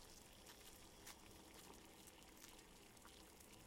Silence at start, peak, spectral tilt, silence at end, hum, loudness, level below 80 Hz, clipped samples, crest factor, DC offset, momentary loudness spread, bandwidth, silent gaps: 0 s; -38 dBFS; -2.5 dB/octave; 0 s; none; -62 LUFS; -72 dBFS; under 0.1%; 26 dB; under 0.1%; 3 LU; 16.5 kHz; none